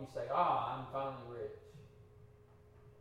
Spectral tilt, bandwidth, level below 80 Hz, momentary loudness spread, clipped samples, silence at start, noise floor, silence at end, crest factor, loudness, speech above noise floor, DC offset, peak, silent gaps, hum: -7 dB/octave; 13.5 kHz; -70 dBFS; 23 LU; under 0.1%; 0 s; -62 dBFS; 0 s; 20 dB; -38 LUFS; 24 dB; under 0.1%; -20 dBFS; none; none